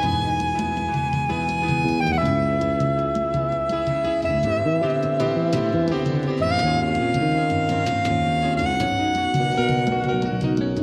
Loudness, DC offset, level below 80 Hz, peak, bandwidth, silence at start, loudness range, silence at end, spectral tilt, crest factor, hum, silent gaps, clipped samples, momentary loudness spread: -22 LUFS; under 0.1%; -40 dBFS; -8 dBFS; 11 kHz; 0 s; 1 LU; 0 s; -6.5 dB/octave; 12 dB; none; none; under 0.1%; 3 LU